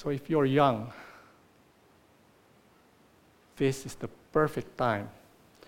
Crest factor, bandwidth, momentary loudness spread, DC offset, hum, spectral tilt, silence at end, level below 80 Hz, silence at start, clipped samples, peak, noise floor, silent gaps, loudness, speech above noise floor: 22 dB; 16.5 kHz; 19 LU; under 0.1%; none; -6.5 dB/octave; 0.55 s; -60 dBFS; 0 s; under 0.1%; -10 dBFS; -62 dBFS; none; -29 LUFS; 33 dB